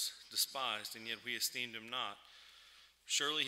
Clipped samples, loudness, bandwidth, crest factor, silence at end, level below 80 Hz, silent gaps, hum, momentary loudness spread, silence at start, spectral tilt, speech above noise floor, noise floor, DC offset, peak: under 0.1%; -38 LUFS; 16 kHz; 22 dB; 0 s; -84 dBFS; none; none; 22 LU; 0 s; 0.5 dB/octave; 23 dB; -63 dBFS; under 0.1%; -18 dBFS